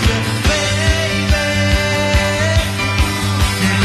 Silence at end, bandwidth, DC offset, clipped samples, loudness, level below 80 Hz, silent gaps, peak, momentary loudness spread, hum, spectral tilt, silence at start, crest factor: 0 s; 13.5 kHz; under 0.1%; under 0.1%; -15 LUFS; -22 dBFS; none; -2 dBFS; 2 LU; none; -4.5 dB/octave; 0 s; 14 dB